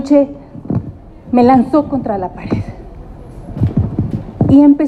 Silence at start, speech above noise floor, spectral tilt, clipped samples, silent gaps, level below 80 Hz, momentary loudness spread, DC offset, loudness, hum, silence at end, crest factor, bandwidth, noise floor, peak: 0 s; 21 dB; -10 dB/octave; under 0.1%; none; -34 dBFS; 23 LU; under 0.1%; -14 LUFS; none; 0 s; 14 dB; 7.4 kHz; -32 dBFS; 0 dBFS